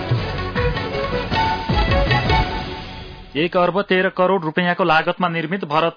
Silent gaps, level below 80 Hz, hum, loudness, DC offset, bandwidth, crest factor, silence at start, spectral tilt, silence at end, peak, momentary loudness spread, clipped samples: none; -30 dBFS; none; -19 LUFS; under 0.1%; 5.4 kHz; 14 dB; 0 s; -7 dB/octave; 0 s; -4 dBFS; 9 LU; under 0.1%